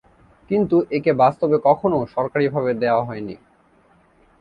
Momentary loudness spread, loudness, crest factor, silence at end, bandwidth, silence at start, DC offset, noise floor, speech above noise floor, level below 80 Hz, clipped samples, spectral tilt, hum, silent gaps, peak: 7 LU; -19 LUFS; 18 dB; 1.05 s; 5.4 kHz; 0.5 s; under 0.1%; -56 dBFS; 37 dB; -56 dBFS; under 0.1%; -9.5 dB/octave; none; none; -2 dBFS